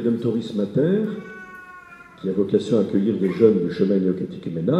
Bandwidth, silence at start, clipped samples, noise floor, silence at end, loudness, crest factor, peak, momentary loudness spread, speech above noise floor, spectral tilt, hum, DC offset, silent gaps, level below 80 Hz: 8.8 kHz; 0 s; under 0.1%; -43 dBFS; 0 s; -21 LUFS; 18 dB; -2 dBFS; 20 LU; 23 dB; -8.5 dB/octave; none; under 0.1%; none; -62 dBFS